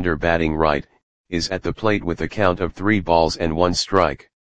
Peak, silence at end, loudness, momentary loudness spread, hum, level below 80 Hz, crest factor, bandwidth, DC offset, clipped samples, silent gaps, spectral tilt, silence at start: 0 dBFS; 0.05 s; -20 LUFS; 7 LU; none; -38 dBFS; 20 dB; 9.8 kHz; 1%; under 0.1%; 1.03-1.24 s; -5 dB/octave; 0 s